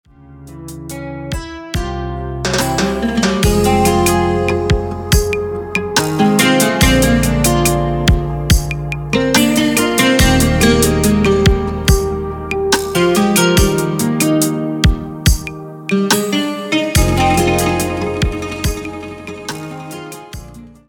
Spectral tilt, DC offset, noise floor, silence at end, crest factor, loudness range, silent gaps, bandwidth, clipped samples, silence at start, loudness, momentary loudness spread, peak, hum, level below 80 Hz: -4.5 dB/octave; under 0.1%; -37 dBFS; 0.2 s; 14 dB; 4 LU; none; 19 kHz; under 0.1%; 0.3 s; -14 LUFS; 15 LU; 0 dBFS; none; -24 dBFS